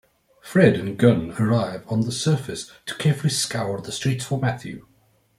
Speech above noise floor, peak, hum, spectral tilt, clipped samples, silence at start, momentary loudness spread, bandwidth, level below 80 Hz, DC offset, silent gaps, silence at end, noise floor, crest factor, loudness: 24 dB; -2 dBFS; none; -5.5 dB/octave; under 0.1%; 0.45 s; 15 LU; 15.5 kHz; -56 dBFS; under 0.1%; none; 0.6 s; -46 dBFS; 20 dB; -22 LUFS